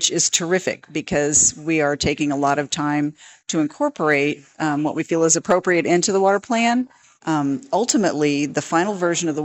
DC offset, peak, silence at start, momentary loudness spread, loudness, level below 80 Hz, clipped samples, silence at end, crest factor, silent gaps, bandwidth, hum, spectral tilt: under 0.1%; -4 dBFS; 0 s; 7 LU; -19 LUFS; -52 dBFS; under 0.1%; 0 s; 16 dB; none; 16 kHz; none; -3.5 dB/octave